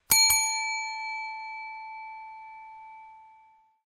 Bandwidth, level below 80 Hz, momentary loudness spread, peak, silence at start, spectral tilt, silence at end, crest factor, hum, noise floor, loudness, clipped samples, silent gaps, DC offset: 14 kHz; -62 dBFS; 26 LU; -6 dBFS; 0.1 s; 3 dB/octave; 0.6 s; 24 dB; none; -60 dBFS; -25 LUFS; under 0.1%; none; under 0.1%